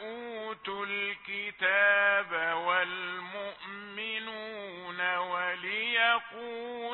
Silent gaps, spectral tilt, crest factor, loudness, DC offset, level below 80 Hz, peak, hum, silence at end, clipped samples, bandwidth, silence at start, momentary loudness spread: none; 1.5 dB/octave; 20 dB; -30 LUFS; under 0.1%; -76 dBFS; -12 dBFS; none; 0 s; under 0.1%; 4.2 kHz; 0 s; 15 LU